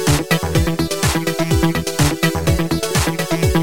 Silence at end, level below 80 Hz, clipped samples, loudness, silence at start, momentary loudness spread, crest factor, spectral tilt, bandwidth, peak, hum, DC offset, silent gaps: 0 s; -28 dBFS; under 0.1%; -17 LUFS; 0 s; 2 LU; 14 dB; -5 dB/octave; 17 kHz; -2 dBFS; none; 2%; none